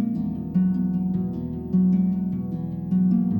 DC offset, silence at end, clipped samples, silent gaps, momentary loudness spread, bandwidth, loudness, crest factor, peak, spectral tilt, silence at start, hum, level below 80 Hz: under 0.1%; 0 s; under 0.1%; none; 8 LU; 1.6 kHz; -24 LUFS; 10 dB; -12 dBFS; -12.5 dB/octave; 0 s; none; -52 dBFS